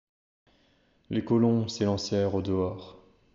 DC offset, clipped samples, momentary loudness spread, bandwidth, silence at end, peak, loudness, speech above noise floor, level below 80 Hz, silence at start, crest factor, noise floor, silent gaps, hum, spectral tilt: under 0.1%; under 0.1%; 10 LU; 7.6 kHz; 0.4 s; -12 dBFS; -28 LUFS; 39 dB; -60 dBFS; 1.1 s; 16 dB; -66 dBFS; none; none; -7 dB/octave